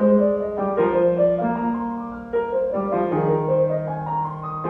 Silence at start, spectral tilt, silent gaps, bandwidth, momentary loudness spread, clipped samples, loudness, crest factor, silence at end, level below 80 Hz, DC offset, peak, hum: 0 s; -11 dB/octave; none; 4 kHz; 8 LU; under 0.1%; -22 LUFS; 14 dB; 0 s; -52 dBFS; under 0.1%; -6 dBFS; none